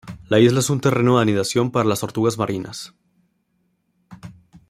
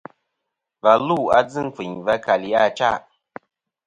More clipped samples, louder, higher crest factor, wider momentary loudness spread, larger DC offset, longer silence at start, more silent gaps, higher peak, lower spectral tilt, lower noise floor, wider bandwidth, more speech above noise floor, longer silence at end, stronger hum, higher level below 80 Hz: neither; about the same, -19 LUFS vs -20 LUFS; about the same, 18 dB vs 20 dB; first, 13 LU vs 10 LU; neither; second, 0.05 s vs 0.85 s; neither; about the same, -2 dBFS vs 0 dBFS; about the same, -5.5 dB/octave vs -5.5 dB/octave; second, -68 dBFS vs -80 dBFS; first, 16 kHz vs 9 kHz; second, 50 dB vs 61 dB; second, 0.35 s vs 0.85 s; neither; about the same, -56 dBFS vs -58 dBFS